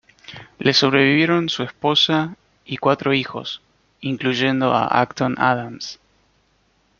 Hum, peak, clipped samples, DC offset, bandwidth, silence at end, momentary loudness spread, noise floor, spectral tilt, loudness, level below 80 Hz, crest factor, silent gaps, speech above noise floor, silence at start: none; -2 dBFS; under 0.1%; under 0.1%; 7.4 kHz; 1.05 s; 17 LU; -62 dBFS; -5 dB/octave; -19 LUFS; -60 dBFS; 18 dB; none; 43 dB; 0.3 s